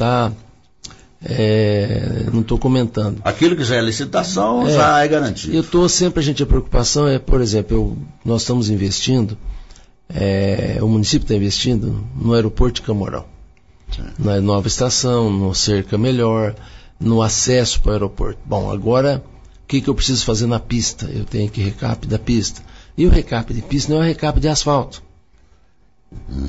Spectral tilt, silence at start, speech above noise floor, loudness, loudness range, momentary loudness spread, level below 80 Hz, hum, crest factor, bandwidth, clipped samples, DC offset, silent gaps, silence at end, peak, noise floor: -5 dB/octave; 0 s; 40 dB; -17 LUFS; 4 LU; 10 LU; -26 dBFS; none; 14 dB; 8 kHz; under 0.1%; under 0.1%; none; 0 s; -4 dBFS; -56 dBFS